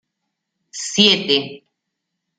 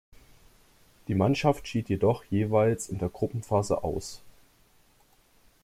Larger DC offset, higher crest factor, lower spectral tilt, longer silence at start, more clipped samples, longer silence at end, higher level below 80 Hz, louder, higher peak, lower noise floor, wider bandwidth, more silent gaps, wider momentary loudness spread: neither; about the same, 22 dB vs 20 dB; second, -2.5 dB/octave vs -6.5 dB/octave; second, 0.75 s vs 1.1 s; neither; second, 0.8 s vs 1.35 s; second, -64 dBFS vs -54 dBFS; first, -15 LUFS vs -28 LUFS; first, 0 dBFS vs -10 dBFS; first, -78 dBFS vs -63 dBFS; second, 9.4 kHz vs 15.5 kHz; neither; first, 21 LU vs 11 LU